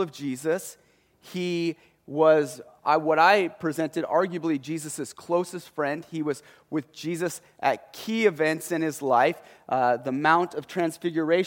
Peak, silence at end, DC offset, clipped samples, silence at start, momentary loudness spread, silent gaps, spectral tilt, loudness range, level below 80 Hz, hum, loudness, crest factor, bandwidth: -4 dBFS; 0 s; under 0.1%; under 0.1%; 0 s; 13 LU; none; -5 dB/octave; 6 LU; -74 dBFS; none; -26 LUFS; 20 dB; 17 kHz